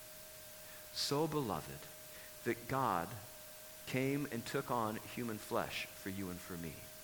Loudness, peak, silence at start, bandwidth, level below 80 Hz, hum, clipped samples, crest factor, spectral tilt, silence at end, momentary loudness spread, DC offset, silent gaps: -41 LUFS; -22 dBFS; 0 s; 20 kHz; -68 dBFS; none; under 0.1%; 20 dB; -4.5 dB/octave; 0 s; 14 LU; under 0.1%; none